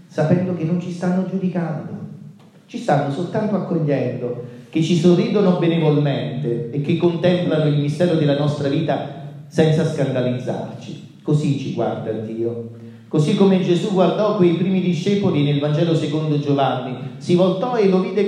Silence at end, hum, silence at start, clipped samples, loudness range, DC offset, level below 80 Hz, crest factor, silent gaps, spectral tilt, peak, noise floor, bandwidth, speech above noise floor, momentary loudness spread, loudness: 0 s; none; 0.1 s; under 0.1%; 5 LU; under 0.1%; -66 dBFS; 16 dB; none; -7.5 dB/octave; -2 dBFS; -42 dBFS; 10 kHz; 23 dB; 12 LU; -19 LUFS